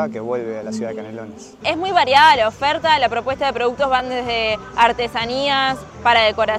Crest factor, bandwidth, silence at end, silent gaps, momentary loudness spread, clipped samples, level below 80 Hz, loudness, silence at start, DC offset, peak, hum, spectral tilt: 16 dB; 14 kHz; 0 s; none; 14 LU; under 0.1%; -46 dBFS; -17 LUFS; 0 s; under 0.1%; -2 dBFS; none; -3.5 dB/octave